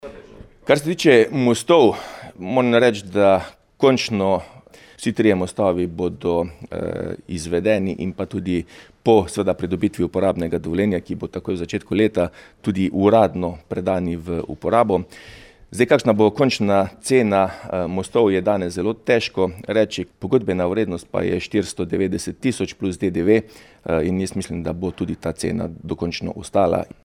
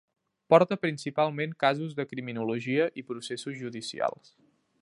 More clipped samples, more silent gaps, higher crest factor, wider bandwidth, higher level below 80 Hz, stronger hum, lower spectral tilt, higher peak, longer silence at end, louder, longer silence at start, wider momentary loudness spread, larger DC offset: neither; neither; second, 18 dB vs 24 dB; first, 14.5 kHz vs 11.5 kHz; first, -48 dBFS vs -76 dBFS; neither; about the same, -6 dB/octave vs -5.5 dB/octave; first, -2 dBFS vs -6 dBFS; second, 0.2 s vs 0.7 s; first, -20 LUFS vs -29 LUFS; second, 0.05 s vs 0.5 s; second, 11 LU vs 14 LU; neither